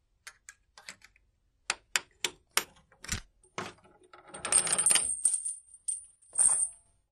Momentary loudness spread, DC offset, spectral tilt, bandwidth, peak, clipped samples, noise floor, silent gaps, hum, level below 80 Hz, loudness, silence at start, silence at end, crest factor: 25 LU; under 0.1%; 0.5 dB/octave; 13 kHz; -6 dBFS; under 0.1%; -71 dBFS; none; none; -60 dBFS; -28 LUFS; 0.25 s; 0.35 s; 28 dB